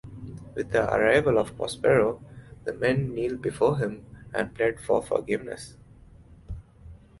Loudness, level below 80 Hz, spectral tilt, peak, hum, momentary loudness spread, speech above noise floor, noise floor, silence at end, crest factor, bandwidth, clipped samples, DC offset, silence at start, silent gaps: -26 LUFS; -50 dBFS; -6 dB/octave; -8 dBFS; none; 21 LU; 26 dB; -51 dBFS; 0.25 s; 20 dB; 11.5 kHz; under 0.1%; under 0.1%; 0.05 s; none